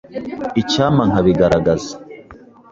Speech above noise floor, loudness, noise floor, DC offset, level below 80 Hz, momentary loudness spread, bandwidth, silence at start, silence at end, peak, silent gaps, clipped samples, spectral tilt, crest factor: 26 dB; -16 LUFS; -42 dBFS; under 0.1%; -40 dBFS; 15 LU; 7.8 kHz; 0.1 s; 0.35 s; -2 dBFS; none; under 0.1%; -6.5 dB/octave; 16 dB